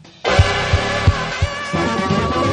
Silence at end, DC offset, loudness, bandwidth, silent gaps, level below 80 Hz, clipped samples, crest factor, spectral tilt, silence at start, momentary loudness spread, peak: 0 s; under 0.1%; -18 LUFS; 10 kHz; none; -26 dBFS; under 0.1%; 18 dB; -5.5 dB/octave; 0.05 s; 5 LU; 0 dBFS